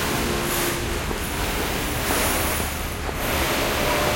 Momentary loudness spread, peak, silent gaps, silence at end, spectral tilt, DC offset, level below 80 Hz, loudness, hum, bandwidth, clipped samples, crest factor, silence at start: 5 LU; -8 dBFS; none; 0 s; -3.5 dB/octave; under 0.1%; -32 dBFS; -23 LUFS; none; 16.5 kHz; under 0.1%; 16 dB; 0 s